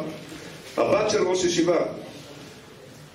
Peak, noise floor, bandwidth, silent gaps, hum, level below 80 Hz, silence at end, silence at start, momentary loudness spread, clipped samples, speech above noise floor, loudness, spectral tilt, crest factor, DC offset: -10 dBFS; -45 dBFS; 15 kHz; none; none; -58 dBFS; 0.05 s; 0 s; 23 LU; under 0.1%; 23 dB; -23 LUFS; -4 dB/octave; 16 dB; under 0.1%